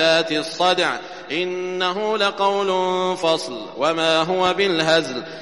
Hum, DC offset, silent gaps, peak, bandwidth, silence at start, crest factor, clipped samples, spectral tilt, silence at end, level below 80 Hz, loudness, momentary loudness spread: none; 0.2%; none; -4 dBFS; 11.5 kHz; 0 s; 16 dB; under 0.1%; -3.5 dB/octave; 0 s; -62 dBFS; -20 LUFS; 7 LU